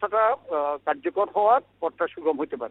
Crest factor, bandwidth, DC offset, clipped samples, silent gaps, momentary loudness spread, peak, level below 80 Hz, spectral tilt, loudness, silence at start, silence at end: 18 dB; 4.1 kHz; under 0.1%; under 0.1%; none; 7 LU; -6 dBFS; -70 dBFS; -8.5 dB/octave; -25 LUFS; 0 s; 0 s